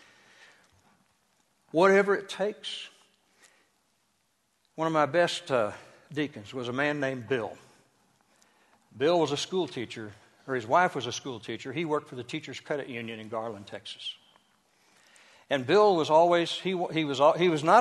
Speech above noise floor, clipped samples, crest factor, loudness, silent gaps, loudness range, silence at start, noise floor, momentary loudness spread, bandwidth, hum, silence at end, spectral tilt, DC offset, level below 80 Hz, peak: 46 dB; under 0.1%; 22 dB; -28 LUFS; none; 8 LU; 1.75 s; -73 dBFS; 17 LU; 12 kHz; none; 0 s; -5 dB/octave; under 0.1%; -74 dBFS; -6 dBFS